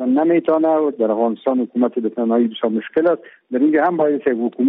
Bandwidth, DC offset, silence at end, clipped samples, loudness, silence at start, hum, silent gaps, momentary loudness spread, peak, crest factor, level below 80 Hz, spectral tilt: 3.9 kHz; under 0.1%; 0 s; under 0.1%; -18 LUFS; 0 s; none; none; 5 LU; -6 dBFS; 12 dB; -68 dBFS; -5.5 dB/octave